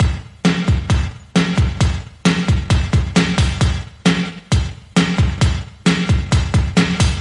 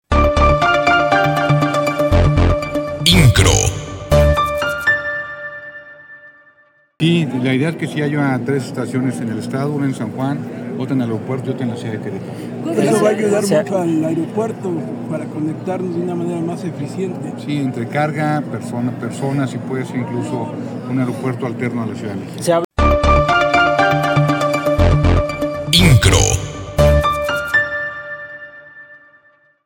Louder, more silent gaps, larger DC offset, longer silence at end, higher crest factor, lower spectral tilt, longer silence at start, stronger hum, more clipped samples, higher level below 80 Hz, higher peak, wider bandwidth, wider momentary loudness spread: about the same, -17 LUFS vs -17 LUFS; second, none vs 22.64-22.70 s; neither; second, 0 s vs 0.7 s; about the same, 16 dB vs 16 dB; about the same, -5.5 dB/octave vs -5 dB/octave; about the same, 0 s vs 0.1 s; neither; neither; about the same, -24 dBFS vs -26 dBFS; about the same, 0 dBFS vs 0 dBFS; second, 11 kHz vs 17.5 kHz; second, 4 LU vs 12 LU